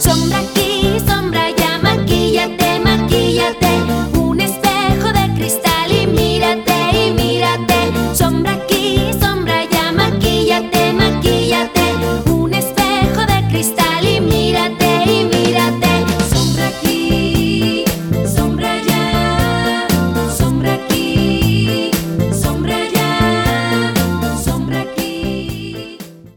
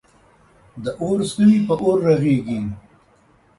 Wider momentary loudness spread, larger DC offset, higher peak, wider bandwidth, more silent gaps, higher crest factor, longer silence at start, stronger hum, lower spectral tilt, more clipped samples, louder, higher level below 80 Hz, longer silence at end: second, 4 LU vs 15 LU; neither; about the same, -2 dBFS vs -4 dBFS; first, over 20 kHz vs 11.5 kHz; neither; about the same, 12 dB vs 16 dB; second, 0 s vs 0.75 s; neither; second, -5 dB/octave vs -7.5 dB/octave; neither; first, -14 LUFS vs -18 LUFS; first, -28 dBFS vs -52 dBFS; second, 0.1 s vs 0.8 s